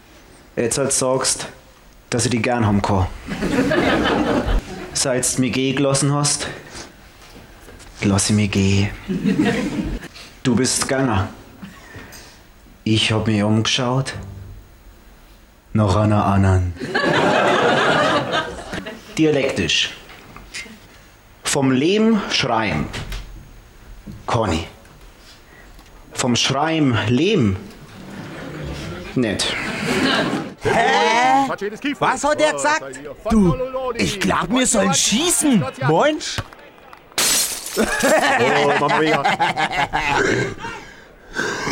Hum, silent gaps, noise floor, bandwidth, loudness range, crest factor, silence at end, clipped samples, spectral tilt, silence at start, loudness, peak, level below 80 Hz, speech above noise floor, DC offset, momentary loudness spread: none; none; -47 dBFS; 17 kHz; 4 LU; 14 dB; 0 s; under 0.1%; -4 dB/octave; 0.55 s; -18 LUFS; -6 dBFS; -38 dBFS; 29 dB; under 0.1%; 17 LU